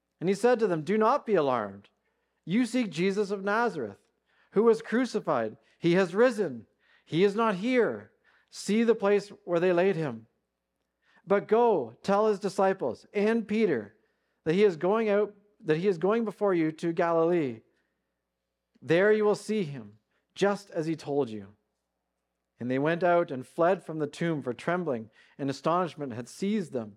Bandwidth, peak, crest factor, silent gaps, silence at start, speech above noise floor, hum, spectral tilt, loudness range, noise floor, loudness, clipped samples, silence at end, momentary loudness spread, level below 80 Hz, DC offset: 11.5 kHz; -12 dBFS; 16 dB; none; 0.2 s; 57 dB; none; -6.5 dB/octave; 3 LU; -84 dBFS; -28 LUFS; under 0.1%; 0.05 s; 11 LU; -80 dBFS; under 0.1%